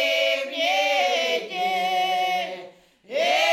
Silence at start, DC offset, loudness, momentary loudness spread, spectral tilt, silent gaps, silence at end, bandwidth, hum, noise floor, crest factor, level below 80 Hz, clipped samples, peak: 0 s; under 0.1%; -23 LUFS; 8 LU; -1 dB/octave; none; 0 s; 17.5 kHz; none; -46 dBFS; 14 dB; -82 dBFS; under 0.1%; -10 dBFS